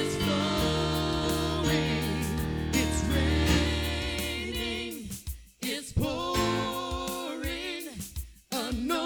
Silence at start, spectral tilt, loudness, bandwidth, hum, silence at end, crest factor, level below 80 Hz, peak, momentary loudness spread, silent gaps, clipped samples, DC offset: 0 s; -4.5 dB/octave; -29 LUFS; over 20 kHz; none; 0 s; 18 dB; -38 dBFS; -10 dBFS; 10 LU; none; under 0.1%; under 0.1%